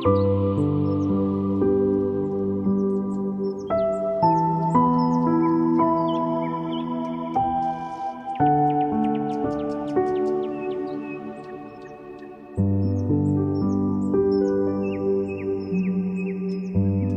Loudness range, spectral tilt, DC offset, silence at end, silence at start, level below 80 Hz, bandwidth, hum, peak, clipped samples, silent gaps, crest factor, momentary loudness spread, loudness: 5 LU; -10 dB/octave; under 0.1%; 0 s; 0 s; -54 dBFS; 8.4 kHz; none; -8 dBFS; under 0.1%; none; 16 dB; 10 LU; -23 LUFS